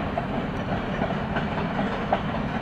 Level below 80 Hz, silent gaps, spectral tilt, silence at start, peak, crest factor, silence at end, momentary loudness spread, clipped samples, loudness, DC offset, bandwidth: -40 dBFS; none; -7.5 dB/octave; 0 s; -10 dBFS; 16 dB; 0 s; 2 LU; under 0.1%; -27 LUFS; under 0.1%; 8.8 kHz